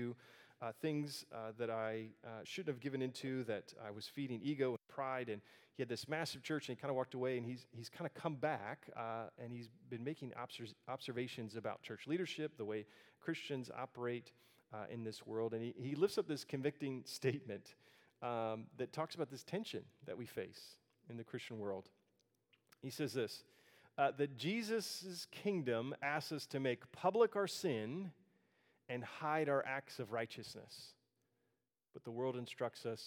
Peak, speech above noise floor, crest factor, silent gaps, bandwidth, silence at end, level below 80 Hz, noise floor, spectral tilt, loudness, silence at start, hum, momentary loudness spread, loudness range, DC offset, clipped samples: -20 dBFS; 44 dB; 24 dB; none; 18 kHz; 0 s; -90 dBFS; -87 dBFS; -5.5 dB/octave; -43 LUFS; 0 s; none; 13 LU; 7 LU; under 0.1%; under 0.1%